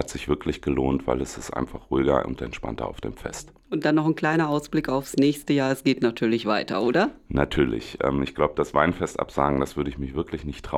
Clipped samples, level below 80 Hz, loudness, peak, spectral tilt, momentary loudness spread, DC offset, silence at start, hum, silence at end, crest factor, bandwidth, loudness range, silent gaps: under 0.1%; -42 dBFS; -25 LUFS; -2 dBFS; -6 dB/octave; 10 LU; under 0.1%; 0 s; none; 0 s; 22 dB; 16 kHz; 4 LU; none